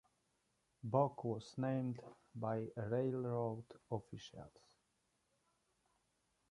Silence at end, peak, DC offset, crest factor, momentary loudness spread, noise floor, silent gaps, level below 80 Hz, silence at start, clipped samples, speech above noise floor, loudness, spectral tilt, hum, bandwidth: 2 s; -20 dBFS; under 0.1%; 24 dB; 17 LU; -83 dBFS; none; -76 dBFS; 0.85 s; under 0.1%; 41 dB; -42 LUFS; -8 dB/octave; none; 11 kHz